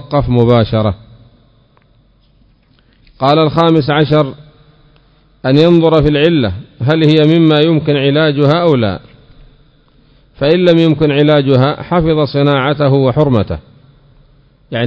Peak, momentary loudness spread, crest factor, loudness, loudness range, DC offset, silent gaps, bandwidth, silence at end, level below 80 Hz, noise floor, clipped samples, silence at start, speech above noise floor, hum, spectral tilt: 0 dBFS; 10 LU; 12 dB; -11 LUFS; 5 LU; under 0.1%; none; 7.2 kHz; 0 s; -36 dBFS; -50 dBFS; 0.5%; 0 s; 40 dB; none; -9 dB/octave